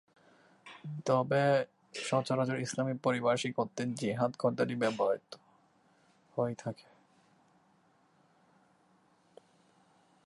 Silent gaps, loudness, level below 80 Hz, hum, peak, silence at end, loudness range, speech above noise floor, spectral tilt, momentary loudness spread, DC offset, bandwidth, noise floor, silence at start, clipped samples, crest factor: none; -33 LUFS; -80 dBFS; none; -16 dBFS; 3.55 s; 12 LU; 37 dB; -5.5 dB/octave; 14 LU; under 0.1%; 11.5 kHz; -69 dBFS; 0.65 s; under 0.1%; 18 dB